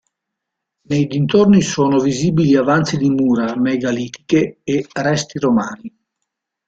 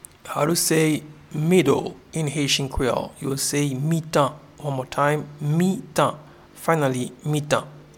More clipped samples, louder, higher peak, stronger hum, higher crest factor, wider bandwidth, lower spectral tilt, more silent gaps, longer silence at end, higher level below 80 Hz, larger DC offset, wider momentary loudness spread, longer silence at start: neither; first, -16 LUFS vs -23 LUFS; about the same, -2 dBFS vs -4 dBFS; neither; about the same, 16 dB vs 18 dB; second, 9 kHz vs 17.5 kHz; first, -6 dB/octave vs -4.5 dB/octave; neither; first, 0.8 s vs 0.15 s; second, -52 dBFS vs -46 dBFS; neither; about the same, 8 LU vs 10 LU; first, 0.9 s vs 0.25 s